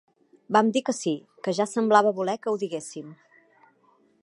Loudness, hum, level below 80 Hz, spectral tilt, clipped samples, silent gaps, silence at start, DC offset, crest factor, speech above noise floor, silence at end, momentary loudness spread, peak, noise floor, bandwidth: -25 LUFS; none; -80 dBFS; -4.5 dB/octave; under 0.1%; none; 0.5 s; under 0.1%; 22 dB; 39 dB; 1.1 s; 15 LU; -4 dBFS; -63 dBFS; 11.5 kHz